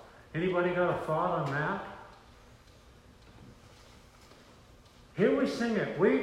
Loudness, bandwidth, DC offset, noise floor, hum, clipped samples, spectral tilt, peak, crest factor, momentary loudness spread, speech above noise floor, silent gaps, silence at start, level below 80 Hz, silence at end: -30 LUFS; 13.5 kHz; under 0.1%; -57 dBFS; none; under 0.1%; -7 dB/octave; -14 dBFS; 18 dB; 17 LU; 28 dB; none; 0 s; -60 dBFS; 0 s